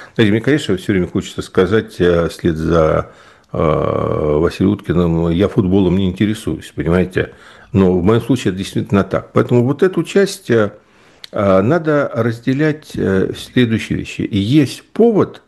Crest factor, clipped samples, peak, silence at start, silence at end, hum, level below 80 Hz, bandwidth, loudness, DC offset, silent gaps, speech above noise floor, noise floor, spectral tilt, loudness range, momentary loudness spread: 14 dB; under 0.1%; 0 dBFS; 0 s; 0.1 s; none; -38 dBFS; 12.5 kHz; -16 LUFS; under 0.1%; none; 27 dB; -41 dBFS; -7 dB/octave; 1 LU; 7 LU